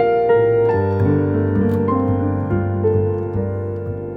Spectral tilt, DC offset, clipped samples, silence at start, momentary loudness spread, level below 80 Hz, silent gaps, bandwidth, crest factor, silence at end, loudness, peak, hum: -11 dB/octave; under 0.1%; under 0.1%; 0 s; 8 LU; -42 dBFS; none; 4.6 kHz; 12 dB; 0 s; -18 LUFS; -6 dBFS; none